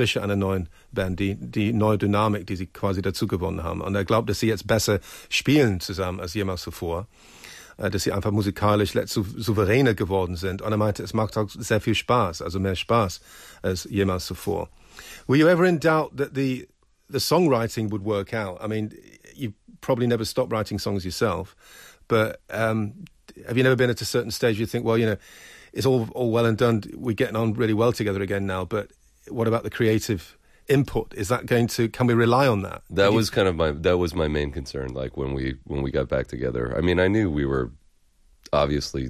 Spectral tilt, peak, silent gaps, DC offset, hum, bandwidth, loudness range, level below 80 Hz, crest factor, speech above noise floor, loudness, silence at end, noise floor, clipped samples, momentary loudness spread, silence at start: -6 dB/octave; -8 dBFS; none; under 0.1%; none; 15 kHz; 4 LU; -42 dBFS; 16 dB; 35 dB; -24 LUFS; 0 s; -58 dBFS; under 0.1%; 11 LU; 0 s